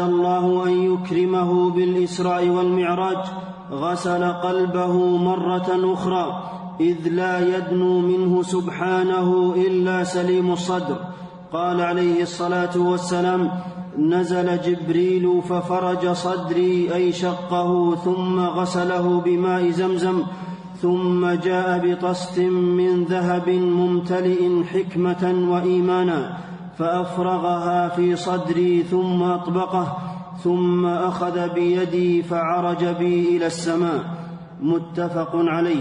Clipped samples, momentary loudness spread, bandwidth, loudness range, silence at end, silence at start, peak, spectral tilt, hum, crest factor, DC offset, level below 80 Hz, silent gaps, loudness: under 0.1%; 6 LU; 10 kHz; 2 LU; 0 s; 0 s; -8 dBFS; -7 dB/octave; none; 12 dB; under 0.1%; -62 dBFS; none; -21 LUFS